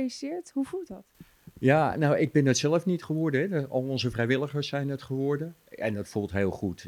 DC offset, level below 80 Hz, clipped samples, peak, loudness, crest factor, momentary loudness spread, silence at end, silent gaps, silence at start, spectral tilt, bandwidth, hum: under 0.1%; -60 dBFS; under 0.1%; -8 dBFS; -28 LUFS; 20 dB; 10 LU; 0 s; none; 0 s; -6 dB/octave; 15.5 kHz; none